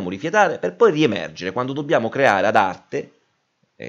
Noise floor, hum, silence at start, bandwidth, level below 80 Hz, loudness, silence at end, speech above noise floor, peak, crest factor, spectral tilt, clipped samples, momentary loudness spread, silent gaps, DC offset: -67 dBFS; none; 0 s; 8.2 kHz; -66 dBFS; -19 LUFS; 0 s; 48 dB; -2 dBFS; 18 dB; -5.5 dB/octave; under 0.1%; 11 LU; none; under 0.1%